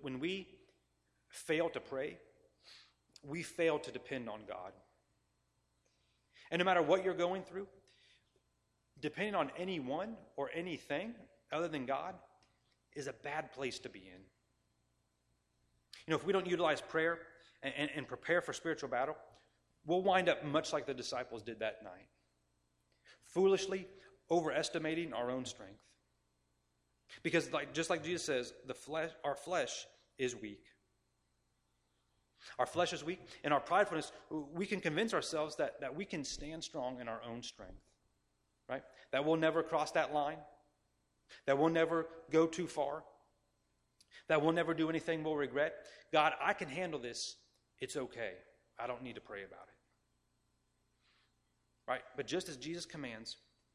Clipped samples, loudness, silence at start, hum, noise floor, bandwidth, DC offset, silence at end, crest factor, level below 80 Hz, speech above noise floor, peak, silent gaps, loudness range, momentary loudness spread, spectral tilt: under 0.1%; -38 LUFS; 0 s; 60 Hz at -75 dBFS; -80 dBFS; 14 kHz; under 0.1%; 0.4 s; 24 dB; -72 dBFS; 42 dB; -14 dBFS; none; 9 LU; 17 LU; -4.5 dB/octave